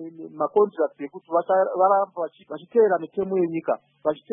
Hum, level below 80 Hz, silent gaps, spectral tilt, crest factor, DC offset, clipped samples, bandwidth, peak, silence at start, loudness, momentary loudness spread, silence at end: none; -74 dBFS; none; -11 dB/octave; 16 dB; under 0.1%; under 0.1%; 3.8 kHz; -6 dBFS; 0 s; -23 LUFS; 12 LU; 0 s